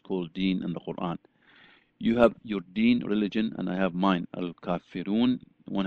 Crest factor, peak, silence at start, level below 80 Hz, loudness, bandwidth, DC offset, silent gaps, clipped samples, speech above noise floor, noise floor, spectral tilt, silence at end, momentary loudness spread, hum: 22 dB; -6 dBFS; 0.1 s; -58 dBFS; -28 LUFS; 6.2 kHz; under 0.1%; none; under 0.1%; 31 dB; -58 dBFS; -8.5 dB/octave; 0 s; 11 LU; none